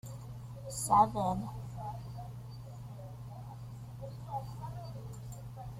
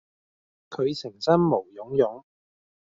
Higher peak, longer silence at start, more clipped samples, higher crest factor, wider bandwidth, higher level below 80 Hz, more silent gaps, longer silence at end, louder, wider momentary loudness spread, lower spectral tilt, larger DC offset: second, -12 dBFS vs -8 dBFS; second, 0.05 s vs 0.7 s; neither; about the same, 24 dB vs 20 dB; first, 16 kHz vs 7.6 kHz; first, -56 dBFS vs -64 dBFS; neither; second, 0 s vs 0.65 s; second, -37 LUFS vs -25 LUFS; first, 19 LU vs 11 LU; about the same, -6 dB/octave vs -6 dB/octave; neither